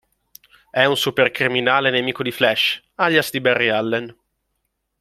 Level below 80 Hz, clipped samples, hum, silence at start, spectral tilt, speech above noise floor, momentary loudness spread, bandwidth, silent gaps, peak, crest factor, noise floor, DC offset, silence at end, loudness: -62 dBFS; under 0.1%; none; 0.75 s; -4 dB/octave; 55 dB; 7 LU; 16 kHz; none; 0 dBFS; 20 dB; -74 dBFS; under 0.1%; 0.9 s; -18 LUFS